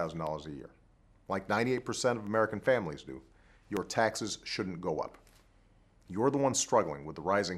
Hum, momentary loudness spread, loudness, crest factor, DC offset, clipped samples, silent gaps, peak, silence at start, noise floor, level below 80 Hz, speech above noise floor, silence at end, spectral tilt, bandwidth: none; 14 LU; -32 LUFS; 22 dB; under 0.1%; under 0.1%; none; -12 dBFS; 0 s; -64 dBFS; -62 dBFS; 31 dB; 0 s; -4 dB/octave; 14 kHz